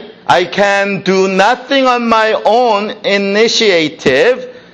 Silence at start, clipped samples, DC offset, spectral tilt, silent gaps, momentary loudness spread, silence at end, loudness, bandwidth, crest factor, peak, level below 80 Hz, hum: 0 s; under 0.1%; under 0.1%; -4 dB/octave; none; 3 LU; 0.15 s; -11 LUFS; 10 kHz; 12 dB; 0 dBFS; -52 dBFS; none